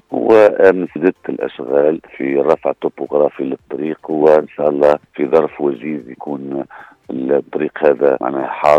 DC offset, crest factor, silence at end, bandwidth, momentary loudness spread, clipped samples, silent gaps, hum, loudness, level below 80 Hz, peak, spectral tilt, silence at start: under 0.1%; 14 dB; 0 s; 7.8 kHz; 12 LU; under 0.1%; none; none; -15 LUFS; -58 dBFS; 0 dBFS; -7.5 dB/octave; 0.1 s